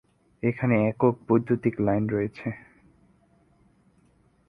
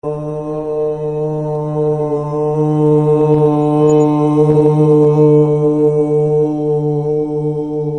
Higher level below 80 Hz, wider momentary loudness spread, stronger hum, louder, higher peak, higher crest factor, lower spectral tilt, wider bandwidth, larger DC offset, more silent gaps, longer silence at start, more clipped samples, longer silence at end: second, -58 dBFS vs -48 dBFS; first, 12 LU vs 9 LU; neither; second, -25 LUFS vs -14 LUFS; second, -8 dBFS vs 0 dBFS; first, 20 dB vs 12 dB; about the same, -11 dB/octave vs -10 dB/octave; second, 5 kHz vs 8.6 kHz; second, under 0.1% vs 0.3%; neither; first, 0.45 s vs 0.05 s; neither; first, 1.9 s vs 0 s